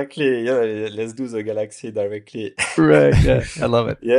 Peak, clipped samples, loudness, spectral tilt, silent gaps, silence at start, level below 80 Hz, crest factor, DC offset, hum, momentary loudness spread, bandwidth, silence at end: -2 dBFS; under 0.1%; -19 LUFS; -6.5 dB/octave; none; 0 s; -32 dBFS; 16 dB; under 0.1%; none; 14 LU; 11.5 kHz; 0 s